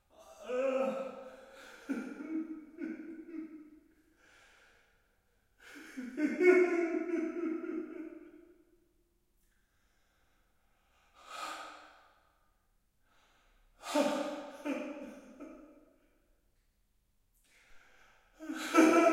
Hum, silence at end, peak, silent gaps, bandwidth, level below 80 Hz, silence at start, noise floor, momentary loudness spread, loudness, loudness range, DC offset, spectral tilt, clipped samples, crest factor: none; 0 s; -12 dBFS; none; 15.5 kHz; -74 dBFS; 0.2 s; -74 dBFS; 25 LU; -34 LUFS; 18 LU; under 0.1%; -3.5 dB/octave; under 0.1%; 26 dB